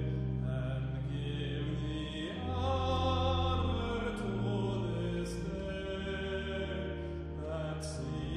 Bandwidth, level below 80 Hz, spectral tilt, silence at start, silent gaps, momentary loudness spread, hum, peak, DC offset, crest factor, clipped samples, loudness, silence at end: 11.5 kHz; -44 dBFS; -6.5 dB/octave; 0 s; none; 7 LU; none; -20 dBFS; under 0.1%; 16 dB; under 0.1%; -36 LUFS; 0 s